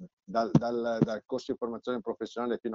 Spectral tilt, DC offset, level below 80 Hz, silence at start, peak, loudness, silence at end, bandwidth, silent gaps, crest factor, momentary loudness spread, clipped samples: -7.5 dB/octave; under 0.1%; -62 dBFS; 0 s; -8 dBFS; -31 LUFS; 0 s; 7.6 kHz; 0.13-0.17 s; 22 dB; 8 LU; under 0.1%